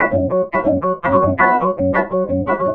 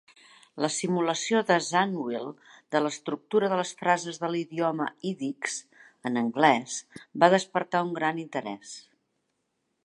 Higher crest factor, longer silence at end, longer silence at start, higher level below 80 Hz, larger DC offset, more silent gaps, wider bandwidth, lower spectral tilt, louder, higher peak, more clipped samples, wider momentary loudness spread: second, 14 dB vs 24 dB; second, 0 s vs 1.05 s; second, 0 s vs 0.55 s; first, -44 dBFS vs -80 dBFS; first, 0.2% vs under 0.1%; neither; second, 4.2 kHz vs 11.5 kHz; first, -10 dB/octave vs -4 dB/octave; first, -16 LUFS vs -27 LUFS; about the same, -2 dBFS vs -4 dBFS; neither; second, 5 LU vs 15 LU